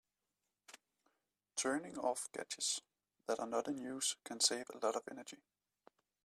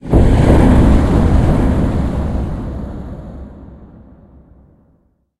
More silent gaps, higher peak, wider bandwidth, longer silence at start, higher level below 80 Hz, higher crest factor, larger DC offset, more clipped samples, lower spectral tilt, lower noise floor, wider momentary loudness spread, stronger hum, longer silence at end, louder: neither; second, -18 dBFS vs 0 dBFS; first, 15 kHz vs 12 kHz; first, 0.7 s vs 0.05 s; second, -86 dBFS vs -18 dBFS; first, 24 dB vs 14 dB; neither; neither; second, -1 dB/octave vs -8.5 dB/octave; first, -90 dBFS vs -57 dBFS; second, 17 LU vs 21 LU; neither; second, 0.9 s vs 1.55 s; second, -39 LUFS vs -13 LUFS